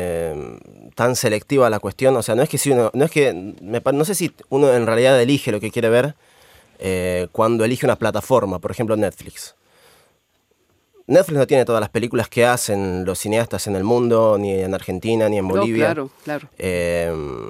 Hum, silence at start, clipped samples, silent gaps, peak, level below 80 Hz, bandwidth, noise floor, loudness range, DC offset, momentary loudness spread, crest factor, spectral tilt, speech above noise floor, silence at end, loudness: none; 0 s; under 0.1%; none; -2 dBFS; -52 dBFS; 16 kHz; -64 dBFS; 4 LU; under 0.1%; 10 LU; 18 dB; -5 dB/octave; 46 dB; 0 s; -19 LUFS